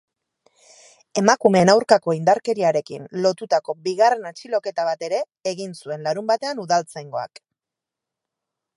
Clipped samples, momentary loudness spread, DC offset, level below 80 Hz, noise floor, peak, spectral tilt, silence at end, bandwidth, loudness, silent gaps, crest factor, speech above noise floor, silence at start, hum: under 0.1%; 15 LU; under 0.1%; -66 dBFS; -87 dBFS; 0 dBFS; -4.5 dB/octave; 1.5 s; 11.5 kHz; -21 LUFS; none; 22 dB; 67 dB; 1.15 s; none